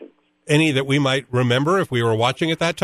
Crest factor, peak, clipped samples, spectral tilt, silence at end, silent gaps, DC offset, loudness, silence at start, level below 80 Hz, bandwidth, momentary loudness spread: 16 dB; -4 dBFS; under 0.1%; -5.5 dB/octave; 0 s; none; under 0.1%; -19 LUFS; 0 s; -56 dBFS; 13.5 kHz; 3 LU